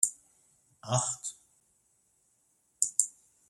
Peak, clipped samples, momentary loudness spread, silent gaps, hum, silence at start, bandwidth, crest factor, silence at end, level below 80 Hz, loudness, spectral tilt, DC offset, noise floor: -4 dBFS; under 0.1%; 13 LU; none; none; 0 s; 16 kHz; 32 dB; 0.4 s; -76 dBFS; -31 LUFS; -2.5 dB/octave; under 0.1%; -72 dBFS